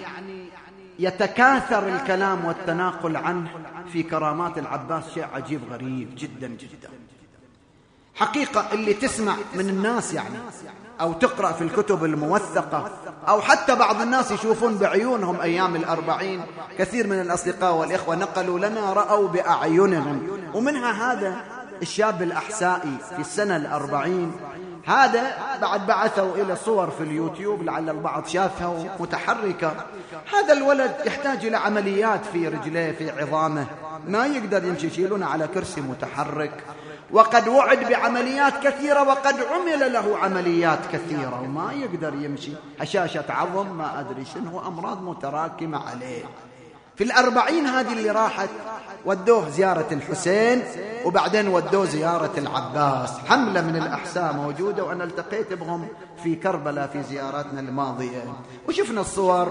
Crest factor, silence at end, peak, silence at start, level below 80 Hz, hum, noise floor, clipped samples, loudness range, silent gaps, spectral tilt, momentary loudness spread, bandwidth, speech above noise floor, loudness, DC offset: 24 dB; 0 s; 0 dBFS; 0 s; -60 dBFS; none; -56 dBFS; under 0.1%; 7 LU; none; -5 dB/octave; 13 LU; 10 kHz; 33 dB; -23 LUFS; under 0.1%